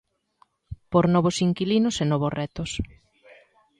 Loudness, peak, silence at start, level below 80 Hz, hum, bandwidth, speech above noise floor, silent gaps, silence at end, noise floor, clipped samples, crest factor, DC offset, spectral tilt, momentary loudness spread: -24 LUFS; -6 dBFS; 0.7 s; -48 dBFS; none; 11 kHz; 41 dB; none; 0.95 s; -64 dBFS; under 0.1%; 18 dB; under 0.1%; -6 dB/octave; 15 LU